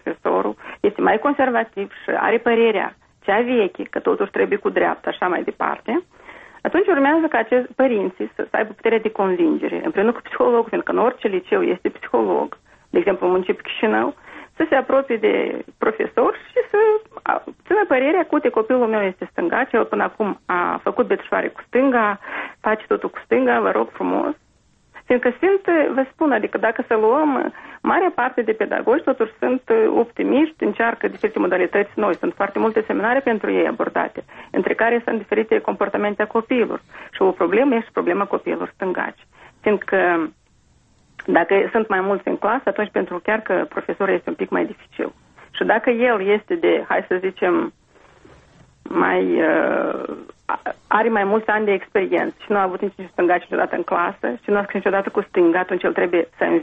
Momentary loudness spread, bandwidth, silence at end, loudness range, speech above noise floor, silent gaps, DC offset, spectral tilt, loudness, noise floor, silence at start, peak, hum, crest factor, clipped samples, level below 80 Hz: 8 LU; 4.6 kHz; 0 s; 2 LU; 38 dB; none; under 0.1%; -8 dB/octave; -20 LUFS; -57 dBFS; 0.05 s; -2 dBFS; none; 18 dB; under 0.1%; -60 dBFS